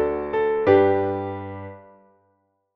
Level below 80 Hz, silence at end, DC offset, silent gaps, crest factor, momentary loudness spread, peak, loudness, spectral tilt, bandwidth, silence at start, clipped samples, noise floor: -54 dBFS; 0.95 s; under 0.1%; none; 18 dB; 19 LU; -4 dBFS; -21 LUFS; -6 dB/octave; 4.8 kHz; 0 s; under 0.1%; -68 dBFS